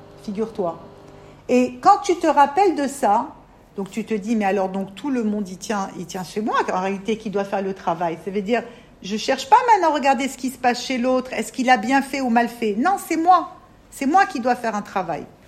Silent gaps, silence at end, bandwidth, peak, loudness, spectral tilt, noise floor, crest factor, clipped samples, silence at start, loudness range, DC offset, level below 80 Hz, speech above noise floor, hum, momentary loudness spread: none; 0.2 s; 15 kHz; -2 dBFS; -21 LUFS; -4.5 dB/octave; -44 dBFS; 20 dB; under 0.1%; 0 s; 5 LU; under 0.1%; -56 dBFS; 23 dB; none; 13 LU